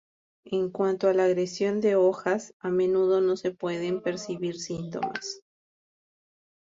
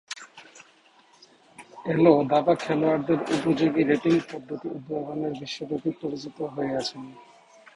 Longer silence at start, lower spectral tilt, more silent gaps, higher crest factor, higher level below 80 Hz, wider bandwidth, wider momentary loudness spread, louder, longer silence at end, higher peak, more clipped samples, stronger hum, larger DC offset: first, 0.45 s vs 0.1 s; about the same, -5.5 dB/octave vs -6.5 dB/octave; first, 2.53-2.60 s vs none; second, 16 dB vs 22 dB; second, -70 dBFS vs -64 dBFS; second, 7.8 kHz vs 11 kHz; second, 10 LU vs 15 LU; about the same, -27 LUFS vs -25 LUFS; first, 1.3 s vs 0.55 s; second, -12 dBFS vs -4 dBFS; neither; neither; neither